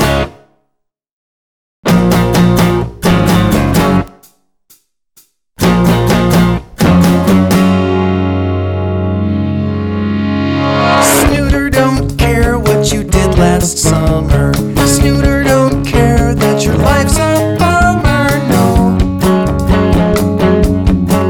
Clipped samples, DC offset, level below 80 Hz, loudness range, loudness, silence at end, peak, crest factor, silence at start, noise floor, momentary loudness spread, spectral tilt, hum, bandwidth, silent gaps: under 0.1%; under 0.1%; -20 dBFS; 3 LU; -11 LUFS; 0 s; 0 dBFS; 10 dB; 0 s; -69 dBFS; 6 LU; -5.5 dB/octave; none; 19.5 kHz; 1.11-1.83 s